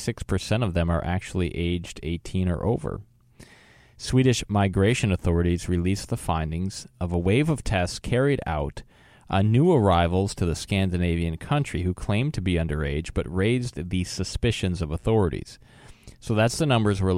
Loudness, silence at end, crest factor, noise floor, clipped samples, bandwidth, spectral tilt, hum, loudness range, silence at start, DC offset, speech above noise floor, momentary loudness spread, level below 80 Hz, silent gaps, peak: -25 LUFS; 0 s; 18 dB; -53 dBFS; under 0.1%; 14 kHz; -6 dB/octave; none; 4 LU; 0 s; under 0.1%; 29 dB; 8 LU; -38 dBFS; none; -6 dBFS